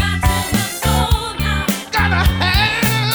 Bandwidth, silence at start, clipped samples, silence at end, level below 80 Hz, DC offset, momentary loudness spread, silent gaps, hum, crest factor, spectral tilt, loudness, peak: over 20 kHz; 0 s; under 0.1%; 0 s; -22 dBFS; under 0.1%; 4 LU; none; none; 14 dB; -4 dB/octave; -16 LUFS; -2 dBFS